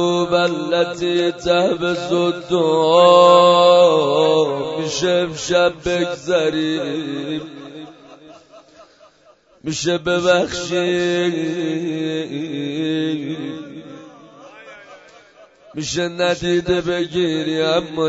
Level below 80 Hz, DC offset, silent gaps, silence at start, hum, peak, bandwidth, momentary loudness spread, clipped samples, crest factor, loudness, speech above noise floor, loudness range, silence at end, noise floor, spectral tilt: -52 dBFS; under 0.1%; none; 0 s; none; 0 dBFS; 8 kHz; 16 LU; under 0.1%; 18 dB; -17 LUFS; 36 dB; 14 LU; 0 s; -52 dBFS; -4.5 dB/octave